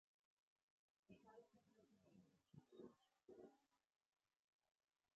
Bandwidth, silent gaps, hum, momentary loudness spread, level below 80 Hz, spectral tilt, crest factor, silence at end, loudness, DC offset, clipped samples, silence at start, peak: 7.2 kHz; none; none; 3 LU; under -90 dBFS; -6.5 dB/octave; 22 dB; 1.4 s; -68 LUFS; under 0.1%; under 0.1%; 1.1 s; -50 dBFS